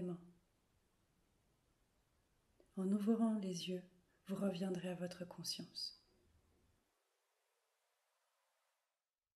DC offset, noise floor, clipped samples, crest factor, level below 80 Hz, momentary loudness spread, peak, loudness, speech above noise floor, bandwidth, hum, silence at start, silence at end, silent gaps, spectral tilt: under 0.1%; under -90 dBFS; under 0.1%; 20 dB; -84 dBFS; 12 LU; -26 dBFS; -43 LUFS; over 49 dB; 14 kHz; none; 0 s; 3.4 s; none; -5.5 dB/octave